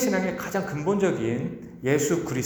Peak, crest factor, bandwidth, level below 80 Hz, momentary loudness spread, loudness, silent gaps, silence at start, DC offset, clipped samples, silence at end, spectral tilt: -8 dBFS; 16 dB; over 20 kHz; -56 dBFS; 7 LU; -26 LUFS; none; 0 s; under 0.1%; under 0.1%; 0 s; -5.5 dB/octave